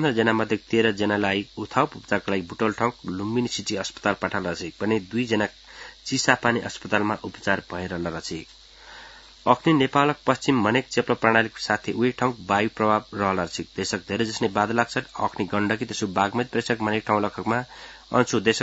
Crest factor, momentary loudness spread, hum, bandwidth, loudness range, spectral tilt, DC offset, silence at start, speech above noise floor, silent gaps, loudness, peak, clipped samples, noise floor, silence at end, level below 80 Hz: 24 dB; 9 LU; none; 8 kHz; 4 LU; -4.5 dB/octave; under 0.1%; 0 s; 22 dB; none; -24 LUFS; 0 dBFS; under 0.1%; -46 dBFS; 0 s; -58 dBFS